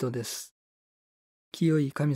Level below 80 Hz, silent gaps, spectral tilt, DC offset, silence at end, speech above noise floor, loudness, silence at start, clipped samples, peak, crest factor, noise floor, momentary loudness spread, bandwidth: -74 dBFS; 0.51-1.52 s; -6 dB/octave; under 0.1%; 0 s; over 62 dB; -29 LUFS; 0 s; under 0.1%; -14 dBFS; 16 dB; under -90 dBFS; 20 LU; 16 kHz